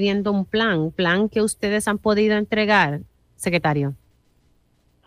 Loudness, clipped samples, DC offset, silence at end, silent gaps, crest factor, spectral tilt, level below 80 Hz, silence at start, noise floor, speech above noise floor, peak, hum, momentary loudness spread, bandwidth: -20 LUFS; under 0.1%; under 0.1%; 1.1 s; none; 16 dB; -5 dB/octave; -52 dBFS; 0 s; -62 dBFS; 42 dB; -6 dBFS; none; 6 LU; 15.5 kHz